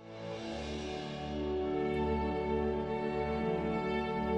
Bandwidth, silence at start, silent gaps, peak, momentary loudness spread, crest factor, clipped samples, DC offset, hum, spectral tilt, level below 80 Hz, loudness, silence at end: 9.4 kHz; 0 s; none; -22 dBFS; 7 LU; 12 dB; under 0.1%; under 0.1%; none; -7 dB/octave; -48 dBFS; -35 LUFS; 0 s